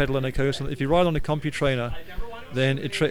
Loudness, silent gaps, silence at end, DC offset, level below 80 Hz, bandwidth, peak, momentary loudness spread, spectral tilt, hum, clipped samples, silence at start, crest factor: -25 LUFS; none; 0 s; 1%; -36 dBFS; 15 kHz; -8 dBFS; 12 LU; -6 dB/octave; none; under 0.1%; 0 s; 16 dB